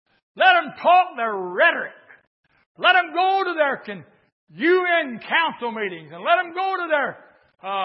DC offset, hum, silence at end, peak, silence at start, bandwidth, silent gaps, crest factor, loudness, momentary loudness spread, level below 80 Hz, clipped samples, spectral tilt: under 0.1%; none; 0 s; -4 dBFS; 0.35 s; 5.8 kHz; 2.27-2.43 s, 2.66-2.75 s, 4.32-4.47 s; 18 dB; -20 LUFS; 12 LU; -82 dBFS; under 0.1%; -8 dB/octave